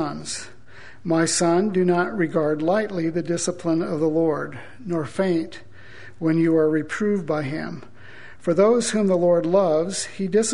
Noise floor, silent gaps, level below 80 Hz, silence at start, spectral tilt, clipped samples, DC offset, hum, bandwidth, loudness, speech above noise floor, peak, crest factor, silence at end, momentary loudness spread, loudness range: -46 dBFS; none; -58 dBFS; 0 s; -5 dB/octave; under 0.1%; 1%; none; 11 kHz; -22 LUFS; 25 dB; -4 dBFS; 18 dB; 0 s; 13 LU; 3 LU